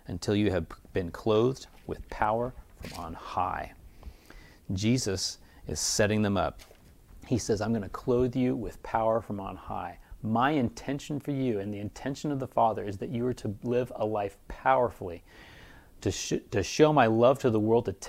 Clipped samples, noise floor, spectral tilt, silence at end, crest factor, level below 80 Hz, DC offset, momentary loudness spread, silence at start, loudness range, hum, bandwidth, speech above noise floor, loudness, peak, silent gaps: under 0.1%; -53 dBFS; -5 dB/octave; 0 s; 22 dB; -52 dBFS; under 0.1%; 15 LU; 0.1 s; 5 LU; none; 16 kHz; 24 dB; -29 LUFS; -8 dBFS; none